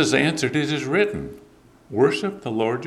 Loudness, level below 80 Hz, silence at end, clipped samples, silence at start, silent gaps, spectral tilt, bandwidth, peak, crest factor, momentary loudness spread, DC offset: -22 LUFS; -54 dBFS; 0 s; under 0.1%; 0 s; none; -5 dB/octave; 13.5 kHz; -4 dBFS; 18 dB; 11 LU; under 0.1%